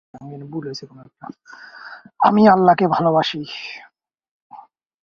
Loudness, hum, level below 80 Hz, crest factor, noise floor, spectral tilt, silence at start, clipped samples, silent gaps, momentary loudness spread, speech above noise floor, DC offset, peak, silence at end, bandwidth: -16 LUFS; none; -62 dBFS; 20 dB; -44 dBFS; -7 dB/octave; 0.15 s; under 0.1%; 4.31-4.50 s; 26 LU; 26 dB; under 0.1%; 0 dBFS; 0.45 s; 7 kHz